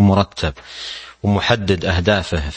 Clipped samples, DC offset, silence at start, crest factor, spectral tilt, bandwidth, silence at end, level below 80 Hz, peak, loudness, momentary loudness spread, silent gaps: under 0.1%; under 0.1%; 0 s; 18 dB; -6 dB/octave; 8.8 kHz; 0 s; -34 dBFS; 0 dBFS; -18 LUFS; 12 LU; none